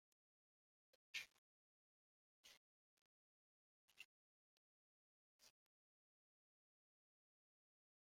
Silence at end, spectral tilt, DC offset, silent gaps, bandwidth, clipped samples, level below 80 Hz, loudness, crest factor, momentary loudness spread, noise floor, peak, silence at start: 2.6 s; 2 dB/octave; under 0.1%; 1.38-2.44 s, 2.57-3.88 s, 4.05-5.39 s; 15 kHz; under 0.1%; under -90 dBFS; -57 LUFS; 34 dB; 16 LU; under -90 dBFS; -36 dBFS; 1.15 s